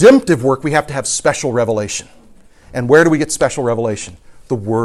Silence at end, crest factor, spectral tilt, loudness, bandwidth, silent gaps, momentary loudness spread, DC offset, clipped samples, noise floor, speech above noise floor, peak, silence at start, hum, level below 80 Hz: 0 s; 14 dB; -5 dB/octave; -15 LUFS; 13.5 kHz; none; 14 LU; under 0.1%; 0.1%; -43 dBFS; 29 dB; 0 dBFS; 0 s; none; -46 dBFS